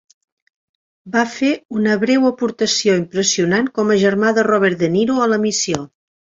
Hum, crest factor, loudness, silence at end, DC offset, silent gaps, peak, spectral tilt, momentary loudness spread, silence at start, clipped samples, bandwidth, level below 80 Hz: none; 16 dB; -16 LUFS; 0.45 s; under 0.1%; 1.65-1.69 s; -2 dBFS; -4 dB/octave; 5 LU; 1.05 s; under 0.1%; 8 kHz; -58 dBFS